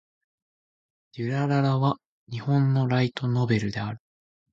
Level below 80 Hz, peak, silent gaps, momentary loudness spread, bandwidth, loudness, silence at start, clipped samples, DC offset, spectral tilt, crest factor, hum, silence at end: -60 dBFS; -10 dBFS; 2.05-2.27 s; 13 LU; 7.6 kHz; -25 LUFS; 1.15 s; under 0.1%; under 0.1%; -8 dB/octave; 16 dB; none; 0.55 s